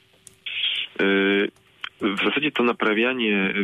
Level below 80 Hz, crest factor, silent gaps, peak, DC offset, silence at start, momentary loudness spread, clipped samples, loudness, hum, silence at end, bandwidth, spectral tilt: -68 dBFS; 14 dB; none; -10 dBFS; under 0.1%; 0.45 s; 11 LU; under 0.1%; -22 LUFS; none; 0 s; 12 kHz; -5.5 dB/octave